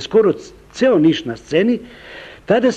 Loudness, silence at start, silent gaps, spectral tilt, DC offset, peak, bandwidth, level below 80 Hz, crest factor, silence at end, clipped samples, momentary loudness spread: -17 LUFS; 0 s; none; -6 dB/octave; under 0.1%; -2 dBFS; 8.8 kHz; -50 dBFS; 14 dB; 0 s; under 0.1%; 21 LU